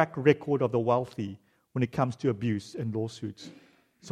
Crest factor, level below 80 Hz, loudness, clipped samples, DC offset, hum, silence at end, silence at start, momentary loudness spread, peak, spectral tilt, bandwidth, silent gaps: 24 dB; -66 dBFS; -29 LUFS; under 0.1%; under 0.1%; none; 0 s; 0 s; 15 LU; -6 dBFS; -7.5 dB/octave; 11.5 kHz; none